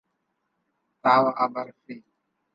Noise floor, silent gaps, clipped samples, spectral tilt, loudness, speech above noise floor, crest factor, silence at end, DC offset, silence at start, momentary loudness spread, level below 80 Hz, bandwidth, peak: -77 dBFS; none; under 0.1%; -7 dB/octave; -22 LUFS; 53 dB; 20 dB; 0.55 s; under 0.1%; 1.05 s; 24 LU; -80 dBFS; 7.2 kHz; -6 dBFS